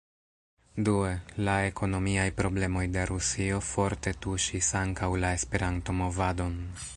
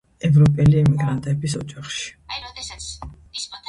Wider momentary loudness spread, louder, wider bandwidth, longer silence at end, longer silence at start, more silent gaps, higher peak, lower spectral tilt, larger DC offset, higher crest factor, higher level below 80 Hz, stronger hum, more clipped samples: second, 4 LU vs 18 LU; second, -29 LUFS vs -19 LUFS; about the same, 11.5 kHz vs 11 kHz; about the same, 0 s vs 0.1 s; first, 0.75 s vs 0.25 s; neither; second, -10 dBFS vs -6 dBFS; second, -4.5 dB/octave vs -6.5 dB/octave; neither; about the same, 20 dB vs 16 dB; about the same, -40 dBFS vs -42 dBFS; neither; neither